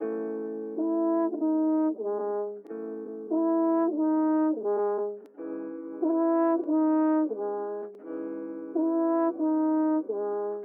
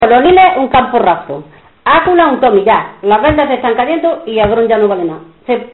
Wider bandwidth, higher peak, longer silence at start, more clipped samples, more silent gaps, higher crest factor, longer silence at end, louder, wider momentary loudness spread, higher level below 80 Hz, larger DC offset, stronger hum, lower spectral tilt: second, 2.4 kHz vs 4.2 kHz; second, -16 dBFS vs 0 dBFS; about the same, 0 s vs 0 s; neither; neither; about the same, 12 dB vs 10 dB; about the same, 0 s vs 0.05 s; second, -28 LUFS vs -10 LUFS; about the same, 12 LU vs 11 LU; second, under -90 dBFS vs -36 dBFS; neither; neither; first, -10.5 dB/octave vs -8.5 dB/octave